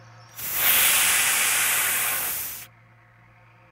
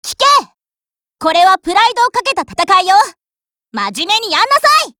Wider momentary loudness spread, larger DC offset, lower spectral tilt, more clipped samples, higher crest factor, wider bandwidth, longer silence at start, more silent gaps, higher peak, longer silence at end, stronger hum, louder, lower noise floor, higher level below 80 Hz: first, 15 LU vs 10 LU; neither; second, 1.5 dB/octave vs -1 dB/octave; neither; first, 20 dB vs 14 dB; second, 16 kHz vs over 20 kHz; first, 0.2 s vs 0.05 s; neither; second, -6 dBFS vs 0 dBFS; first, 1.05 s vs 0.1 s; neither; second, -19 LUFS vs -12 LUFS; second, -54 dBFS vs under -90 dBFS; second, -60 dBFS vs -54 dBFS